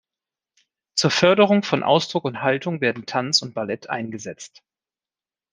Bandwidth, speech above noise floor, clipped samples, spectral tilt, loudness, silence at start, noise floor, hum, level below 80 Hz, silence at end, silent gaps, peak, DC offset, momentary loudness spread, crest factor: 10 kHz; over 69 dB; under 0.1%; -4 dB/octave; -20 LUFS; 0.95 s; under -90 dBFS; none; -68 dBFS; 1.05 s; none; -2 dBFS; under 0.1%; 16 LU; 22 dB